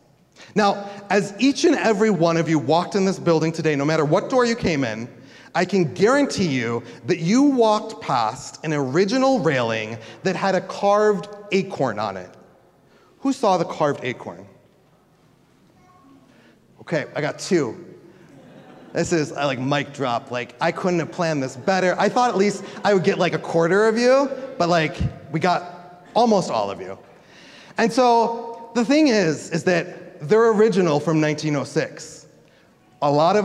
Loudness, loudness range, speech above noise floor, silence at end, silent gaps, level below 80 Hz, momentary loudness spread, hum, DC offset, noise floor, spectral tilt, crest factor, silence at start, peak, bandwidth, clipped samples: -21 LUFS; 7 LU; 37 dB; 0 s; none; -52 dBFS; 11 LU; none; under 0.1%; -57 dBFS; -5.5 dB/octave; 16 dB; 0.4 s; -4 dBFS; 12 kHz; under 0.1%